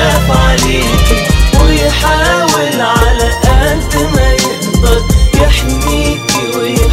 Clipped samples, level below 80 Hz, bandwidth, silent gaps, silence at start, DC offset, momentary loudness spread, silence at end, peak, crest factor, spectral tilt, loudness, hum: 0.4%; -12 dBFS; 16 kHz; none; 0 s; under 0.1%; 4 LU; 0 s; 0 dBFS; 8 dB; -4.5 dB/octave; -10 LUFS; none